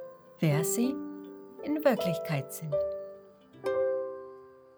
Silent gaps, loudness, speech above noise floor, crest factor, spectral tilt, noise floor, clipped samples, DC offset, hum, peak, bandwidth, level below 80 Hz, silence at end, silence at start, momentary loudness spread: none; -31 LUFS; 24 dB; 20 dB; -5.5 dB/octave; -53 dBFS; under 0.1%; under 0.1%; none; -12 dBFS; over 20 kHz; -68 dBFS; 0.2 s; 0 s; 19 LU